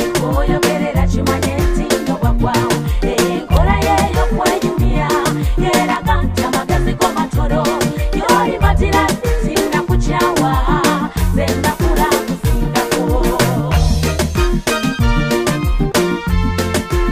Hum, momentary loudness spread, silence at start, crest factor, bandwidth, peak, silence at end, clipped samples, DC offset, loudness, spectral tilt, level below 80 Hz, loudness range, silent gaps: none; 3 LU; 0 s; 14 dB; 15.5 kHz; 0 dBFS; 0 s; under 0.1%; under 0.1%; -15 LUFS; -5.5 dB/octave; -20 dBFS; 1 LU; none